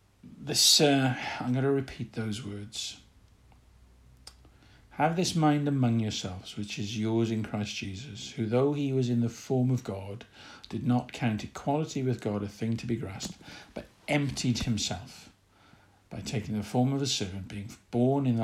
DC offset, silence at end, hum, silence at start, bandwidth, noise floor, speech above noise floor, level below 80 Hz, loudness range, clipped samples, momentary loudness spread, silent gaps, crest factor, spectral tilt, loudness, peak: under 0.1%; 0 s; none; 0.25 s; 15.5 kHz; -60 dBFS; 31 dB; -58 dBFS; 5 LU; under 0.1%; 15 LU; none; 20 dB; -4.5 dB/octave; -29 LUFS; -10 dBFS